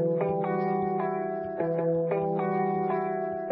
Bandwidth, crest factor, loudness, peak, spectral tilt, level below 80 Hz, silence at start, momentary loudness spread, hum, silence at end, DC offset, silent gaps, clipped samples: 5.2 kHz; 12 dB; -28 LUFS; -14 dBFS; -12.5 dB/octave; -66 dBFS; 0 s; 4 LU; none; 0 s; under 0.1%; none; under 0.1%